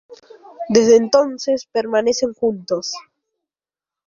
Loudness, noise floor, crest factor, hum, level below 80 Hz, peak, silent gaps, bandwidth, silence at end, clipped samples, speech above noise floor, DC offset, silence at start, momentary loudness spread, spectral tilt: -17 LUFS; under -90 dBFS; 18 dB; none; -60 dBFS; 0 dBFS; none; 7.4 kHz; 1.05 s; under 0.1%; over 73 dB; under 0.1%; 0.1 s; 13 LU; -4 dB/octave